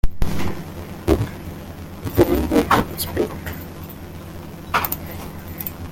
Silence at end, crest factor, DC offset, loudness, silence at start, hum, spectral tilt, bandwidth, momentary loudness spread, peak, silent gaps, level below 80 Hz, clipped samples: 0 s; 20 dB; under 0.1%; -23 LUFS; 0.05 s; none; -6 dB/octave; 17 kHz; 17 LU; -2 dBFS; none; -32 dBFS; under 0.1%